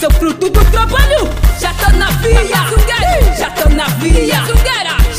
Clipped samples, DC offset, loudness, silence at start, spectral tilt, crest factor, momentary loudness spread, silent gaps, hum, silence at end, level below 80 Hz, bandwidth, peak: under 0.1%; under 0.1%; -12 LUFS; 0 s; -4.5 dB/octave; 10 dB; 3 LU; none; none; 0 s; -12 dBFS; 16 kHz; 0 dBFS